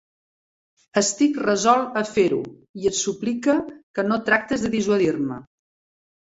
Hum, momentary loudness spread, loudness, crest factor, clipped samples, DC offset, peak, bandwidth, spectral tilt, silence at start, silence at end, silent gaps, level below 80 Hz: none; 9 LU; -22 LUFS; 20 dB; under 0.1%; under 0.1%; -4 dBFS; 8.2 kHz; -4 dB/octave; 0.95 s; 0.8 s; 2.69-2.74 s, 3.83-3.94 s; -58 dBFS